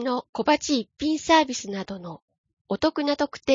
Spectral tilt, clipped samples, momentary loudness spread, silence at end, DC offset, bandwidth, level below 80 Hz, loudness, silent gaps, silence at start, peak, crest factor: -3.5 dB/octave; under 0.1%; 14 LU; 0 s; under 0.1%; 7.6 kHz; -56 dBFS; -24 LUFS; 0.29-0.33 s, 2.22-2.28 s, 2.38-2.44 s, 2.53-2.65 s; 0 s; -6 dBFS; 18 dB